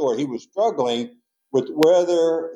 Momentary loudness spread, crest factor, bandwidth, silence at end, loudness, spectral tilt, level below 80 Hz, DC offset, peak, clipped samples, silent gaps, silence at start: 11 LU; 16 dB; 16 kHz; 0 s; -20 LUFS; -5 dB/octave; -80 dBFS; under 0.1%; -4 dBFS; under 0.1%; none; 0 s